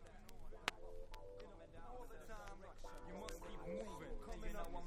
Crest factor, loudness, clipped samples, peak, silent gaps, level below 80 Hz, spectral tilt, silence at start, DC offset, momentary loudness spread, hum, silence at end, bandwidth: 34 dB; -53 LUFS; under 0.1%; -16 dBFS; none; -54 dBFS; -4 dB/octave; 0 s; under 0.1%; 12 LU; none; 0 s; 15.5 kHz